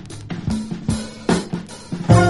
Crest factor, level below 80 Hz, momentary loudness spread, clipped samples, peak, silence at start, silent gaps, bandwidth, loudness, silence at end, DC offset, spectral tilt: 18 dB; -36 dBFS; 10 LU; under 0.1%; 0 dBFS; 0 s; none; 11.5 kHz; -23 LUFS; 0 s; 0.3%; -6.5 dB/octave